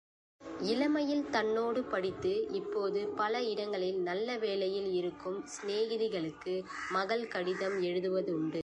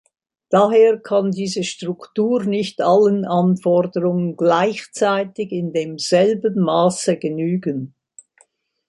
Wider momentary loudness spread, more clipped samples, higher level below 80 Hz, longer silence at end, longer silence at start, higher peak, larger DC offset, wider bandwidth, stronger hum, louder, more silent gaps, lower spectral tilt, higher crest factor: second, 6 LU vs 9 LU; neither; about the same, -70 dBFS vs -66 dBFS; second, 0 s vs 1 s; about the same, 0.4 s vs 0.5 s; second, -18 dBFS vs -2 dBFS; neither; about the same, 10.5 kHz vs 11.5 kHz; neither; second, -34 LUFS vs -18 LUFS; neither; about the same, -5 dB/octave vs -6 dB/octave; about the same, 16 dB vs 16 dB